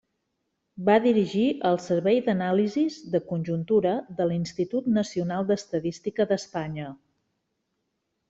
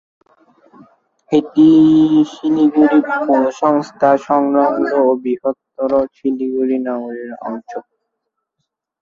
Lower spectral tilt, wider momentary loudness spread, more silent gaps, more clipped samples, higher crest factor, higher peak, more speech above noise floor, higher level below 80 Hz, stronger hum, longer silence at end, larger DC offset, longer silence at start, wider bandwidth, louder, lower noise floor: about the same, -7 dB/octave vs -7.5 dB/octave; second, 8 LU vs 16 LU; neither; neither; about the same, 18 dB vs 14 dB; second, -8 dBFS vs -2 dBFS; second, 53 dB vs 61 dB; second, -64 dBFS vs -58 dBFS; neither; first, 1.35 s vs 1.2 s; neither; second, 0.75 s vs 1.3 s; first, 8 kHz vs 7.2 kHz; second, -26 LUFS vs -14 LUFS; about the same, -78 dBFS vs -75 dBFS